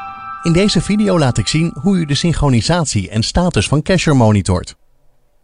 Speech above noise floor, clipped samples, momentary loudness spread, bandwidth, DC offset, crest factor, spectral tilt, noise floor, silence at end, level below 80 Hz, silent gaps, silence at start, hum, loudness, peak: 37 dB; under 0.1%; 6 LU; 11 kHz; 0.7%; 14 dB; -5.5 dB/octave; -51 dBFS; 0.7 s; -30 dBFS; none; 0 s; none; -14 LUFS; -2 dBFS